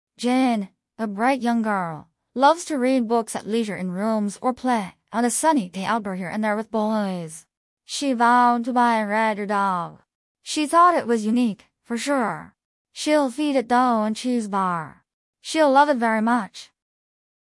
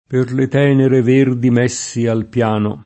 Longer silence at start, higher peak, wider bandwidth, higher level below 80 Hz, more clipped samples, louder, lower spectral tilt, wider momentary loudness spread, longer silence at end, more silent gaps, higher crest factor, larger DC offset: about the same, 0.2 s vs 0.1 s; second, -4 dBFS vs 0 dBFS; first, 12 kHz vs 8.6 kHz; second, -68 dBFS vs -54 dBFS; neither; second, -22 LUFS vs -15 LUFS; second, -4.5 dB/octave vs -6.5 dB/octave; first, 14 LU vs 6 LU; first, 0.9 s vs 0.05 s; first, 7.57-7.77 s, 10.15-10.35 s, 12.65-12.85 s, 15.13-15.33 s vs none; about the same, 18 dB vs 14 dB; neither